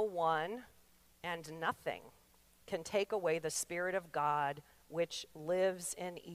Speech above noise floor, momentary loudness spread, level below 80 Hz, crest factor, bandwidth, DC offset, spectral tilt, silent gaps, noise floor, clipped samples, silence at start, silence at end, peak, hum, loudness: 29 dB; 10 LU; -74 dBFS; 18 dB; 15.5 kHz; under 0.1%; -3.5 dB/octave; none; -67 dBFS; under 0.1%; 0 s; 0 s; -22 dBFS; none; -38 LUFS